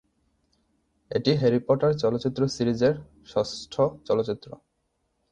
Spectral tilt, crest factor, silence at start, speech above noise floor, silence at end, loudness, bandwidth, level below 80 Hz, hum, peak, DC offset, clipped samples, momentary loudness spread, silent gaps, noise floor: -6.5 dB/octave; 18 dB; 1.1 s; 50 dB; 0.75 s; -25 LUFS; 9.6 kHz; -58 dBFS; none; -8 dBFS; under 0.1%; under 0.1%; 9 LU; none; -74 dBFS